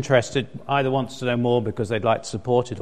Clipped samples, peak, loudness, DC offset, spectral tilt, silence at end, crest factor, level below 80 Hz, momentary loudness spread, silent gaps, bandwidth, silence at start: under 0.1%; -4 dBFS; -23 LUFS; 0.7%; -6 dB/octave; 0 s; 18 dB; -54 dBFS; 5 LU; none; 10.5 kHz; 0 s